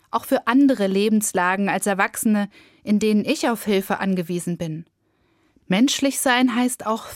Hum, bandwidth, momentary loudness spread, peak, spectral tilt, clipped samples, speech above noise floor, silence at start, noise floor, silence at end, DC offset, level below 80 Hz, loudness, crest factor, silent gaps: none; 16.5 kHz; 9 LU; -4 dBFS; -4.5 dB/octave; under 0.1%; 44 dB; 0.15 s; -65 dBFS; 0 s; under 0.1%; -62 dBFS; -20 LUFS; 18 dB; none